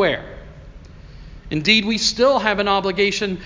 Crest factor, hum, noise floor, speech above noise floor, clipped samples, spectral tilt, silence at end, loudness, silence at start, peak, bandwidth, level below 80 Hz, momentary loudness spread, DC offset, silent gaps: 18 dB; none; -40 dBFS; 21 dB; under 0.1%; -3.5 dB/octave; 0 s; -18 LUFS; 0 s; -2 dBFS; 7.6 kHz; -42 dBFS; 12 LU; under 0.1%; none